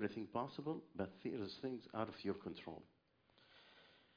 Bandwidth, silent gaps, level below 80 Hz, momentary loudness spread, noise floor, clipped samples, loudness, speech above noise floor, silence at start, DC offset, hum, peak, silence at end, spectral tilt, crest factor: 5.2 kHz; none; -80 dBFS; 20 LU; -74 dBFS; under 0.1%; -47 LUFS; 28 dB; 0 s; under 0.1%; none; -26 dBFS; 0.2 s; -5 dB/octave; 20 dB